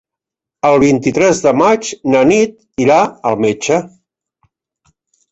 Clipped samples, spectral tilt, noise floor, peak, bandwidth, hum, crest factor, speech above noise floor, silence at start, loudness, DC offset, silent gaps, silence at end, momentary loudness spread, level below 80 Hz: under 0.1%; -5 dB/octave; -84 dBFS; -2 dBFS; 8.2 kHz; none; 12 dB; 72 dB; 0.65 s; -13 LUFS; under 0.1%; none; 1.45 s; 6 LU; -50 dBFS